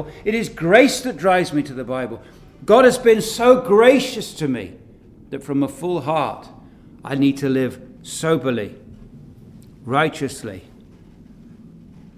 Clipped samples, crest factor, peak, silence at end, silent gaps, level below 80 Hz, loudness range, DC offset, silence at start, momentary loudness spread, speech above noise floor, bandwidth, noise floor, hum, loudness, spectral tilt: under 0.1%; 20 dB; 0 dBFS; 1.55 s; none; -50 dBFS; 9 LU; under 0.1%; 0 s; 21 LU; 27 dB; 15.5 kHz; -45 dBFS; none; -18 LUFS; -5 dB/octave